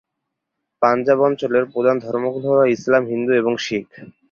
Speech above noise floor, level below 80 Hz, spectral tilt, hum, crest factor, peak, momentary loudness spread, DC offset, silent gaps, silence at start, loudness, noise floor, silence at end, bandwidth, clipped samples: 61 dB; -64 dBFS; -6 dB/octave; none; 18 dB; -2 dBFS; 7 LU; under 0.1%; none; 0.8 s; -18 LUFS; -79 dBFS; 0.2 s; 7.2 kHz; under 0.1%